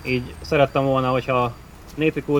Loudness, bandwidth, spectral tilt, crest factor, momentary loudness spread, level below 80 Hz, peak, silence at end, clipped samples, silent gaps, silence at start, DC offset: -21 LUFS; 18.5 kHz; -7 dB/octave; 18 dB; 9 LU; -42 dBFS; -4 dBFS; 0 s; under 0.1%; none; 0 s; under 0.1%